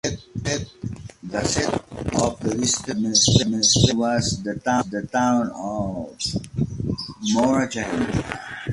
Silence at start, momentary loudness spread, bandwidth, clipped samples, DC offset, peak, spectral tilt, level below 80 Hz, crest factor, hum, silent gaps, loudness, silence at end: 0.05 s; 12 LU; 11.5 kHz; under 0.1%; under 0.1%; -2 dBFS; -4 dB/octave; -42 dBFS; 20 dB; none; none; -22 LUFS; 0 s